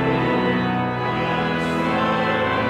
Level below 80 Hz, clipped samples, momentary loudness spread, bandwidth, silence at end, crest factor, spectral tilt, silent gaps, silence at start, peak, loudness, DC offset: -46 dBFS; under 0.1%; 3 LU; 14 kHz; 0 s; 12 dB; -7 dB/octave; none; 0 s; -8 dBFS; -21 LUFS; under 0.1%